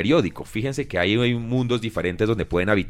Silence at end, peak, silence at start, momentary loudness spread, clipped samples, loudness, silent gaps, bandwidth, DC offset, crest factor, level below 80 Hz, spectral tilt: 0 s; -6 dBFS; 0 s; 7 LU; under 0.1%; -23 LUFS; none; 14 kHz; under 0.1%; 16 dB; -44 dBFS; -6.5 dB/octave